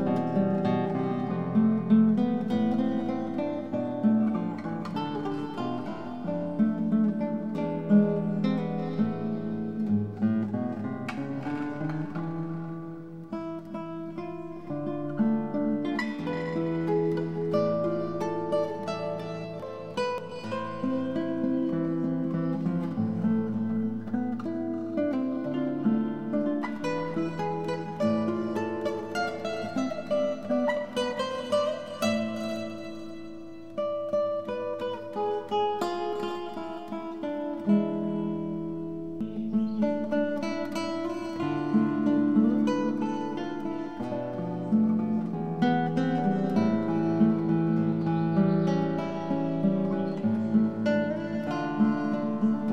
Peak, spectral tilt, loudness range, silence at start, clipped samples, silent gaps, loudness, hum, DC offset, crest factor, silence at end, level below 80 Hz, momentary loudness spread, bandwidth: -10 dBFS; -8 dB/octave; 6 LU; 0 s; under 0.1%; none; -29 LUFS; none; 0.3%; 16 dB; 0 s; -64 dBFS; 10 LU; 9 kHz